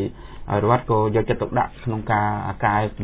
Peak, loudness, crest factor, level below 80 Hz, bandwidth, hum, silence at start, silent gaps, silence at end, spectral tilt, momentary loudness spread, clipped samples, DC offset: -4 dBFS; -22 LUFS; 18 dB; -42 dBFS; 4 kHz; none; 0 s; none; 0 s; -11.5 dB/octave; 7 LU; under 0.1%; under 0.1%